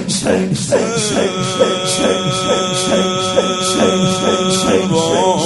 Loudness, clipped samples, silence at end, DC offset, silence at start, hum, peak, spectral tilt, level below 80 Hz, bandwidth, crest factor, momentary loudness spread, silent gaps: -14 LUFS; under 0.1%; 0 s; under 0.1%; 0 s; none; 0 dBFS; -4 dB/octave; -46 dBFS; 12 kHz; 14 dB; 2 LU; none